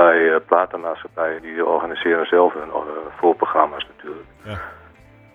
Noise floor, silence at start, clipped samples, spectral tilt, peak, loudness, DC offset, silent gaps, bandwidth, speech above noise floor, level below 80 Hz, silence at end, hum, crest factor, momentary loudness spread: -47 dBFS; 0 s; under 0.1%; -7 dB/octave; 0 dBFS; -19 LUFS; under 0.1%; none; 4 kHz; 27 dB; -54 dBFS; 0.6 s; none; 20 dB; 17 LU